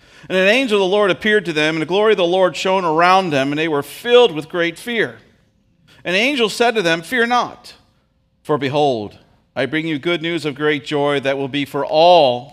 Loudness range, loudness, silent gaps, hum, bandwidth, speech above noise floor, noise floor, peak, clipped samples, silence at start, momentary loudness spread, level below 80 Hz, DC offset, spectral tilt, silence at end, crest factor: 5 LU; -16 LUFS; none; none; 15.5 kHz; 45 dB; -61 dBFS; 0 dBFS; under 0.1%; 0.3 s; 9 LU; -60 dBFS; under 0.1%; -4.5 dB/octave; 0.05 s; 16 dB